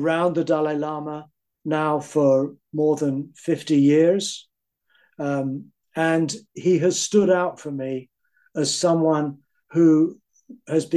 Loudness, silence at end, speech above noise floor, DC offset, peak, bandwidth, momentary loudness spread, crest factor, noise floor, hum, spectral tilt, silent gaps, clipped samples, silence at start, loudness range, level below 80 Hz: -22 LUFS; 0 s; 46 dB; under 0.1%; -6 dBFS; 12.5 kHz; 13 LU; 16 dB; -67 dBFS; none; -5.5 dB/octave; none; under 0.1%; 0 s; 2 LU; -72 dBFS